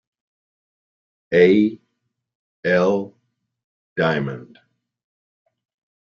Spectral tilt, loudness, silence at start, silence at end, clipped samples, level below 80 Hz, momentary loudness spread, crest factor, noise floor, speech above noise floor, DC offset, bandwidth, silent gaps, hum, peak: -7.5 dB/octave; -19 LUFS; 1.3 s; 1.7 s; under 0.1%; -64 dBFS; 17 LU; 20 dB; -75 dBFS; 58 dB; under 0.1%; 7 kHz; 2.35-2.63 s, 3.64-3.96 s; none; -2 dBFS